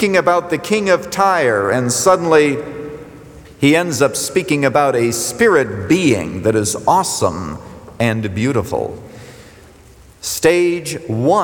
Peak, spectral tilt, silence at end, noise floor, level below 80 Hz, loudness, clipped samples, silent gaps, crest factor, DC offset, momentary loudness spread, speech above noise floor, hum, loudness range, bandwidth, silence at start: -2 dBFS; -4.5 dB/octave; 0 s; -43 dBFS; -48 dBFS; -15 LUFS; under 0.1%; none; 14 dB; under 0.1%; 14 LU; 28 dB; none; 5 LU; over 20 kHz; 0 s